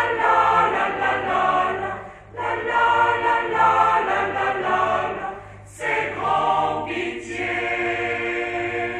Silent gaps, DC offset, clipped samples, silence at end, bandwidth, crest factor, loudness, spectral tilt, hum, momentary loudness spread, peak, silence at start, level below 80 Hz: none; under 0.1%; under 0.1%; 0 s; 11 kHz; 16 dB; -21 LUFS; -4.5 dB/octave; 50 Hz at -50 dBFS; 11 LU; -6 dBFS; 0 s; -52 dBFS